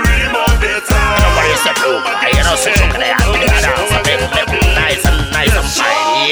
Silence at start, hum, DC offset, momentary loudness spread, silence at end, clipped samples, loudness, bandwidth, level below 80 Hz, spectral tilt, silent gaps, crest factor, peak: 0 s; none; under 0.1%; 3 LU; 0 s; under 0.1%; -12 LUFS; over 20 kHz; -18 dBFS; -3.5 dB/octave; none; 12 dB; 0 dBFS